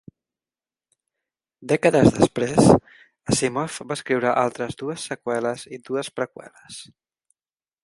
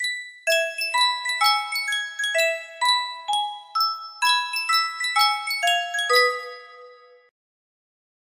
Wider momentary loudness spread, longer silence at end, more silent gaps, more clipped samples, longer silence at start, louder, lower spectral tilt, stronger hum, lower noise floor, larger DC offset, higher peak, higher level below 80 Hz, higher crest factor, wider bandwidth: first, 19 LU vs 6 LU; second, 1 s vs 1.35 s; neither; neither; first, 1.6 s vs 0 s; about the same, -22 LUFS vs -22 LUFS; first, -5.5 dB/octave vs 4 dB/octave; neither; first, under -90 dBFS vs -48 dBFS; neither; first, 0 dBFS vs -4 dBFS; first, -50 dBFS vs -78 dBFS; about the same, 22 dB vs 20 dB; second, 11.5 kHz vs 16 kHz